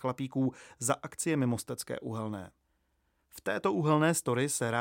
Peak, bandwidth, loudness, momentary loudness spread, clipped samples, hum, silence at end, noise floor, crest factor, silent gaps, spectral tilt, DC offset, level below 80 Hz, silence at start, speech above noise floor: -12 dBFS; 17 kHz; -32 LUFS; 11 LU; under 0.1%; none; 0 s; -76 dBFS; 20 dB; none; -5 dB/octave; under 0.1%; -70 dBFS; 0 s; 44 dB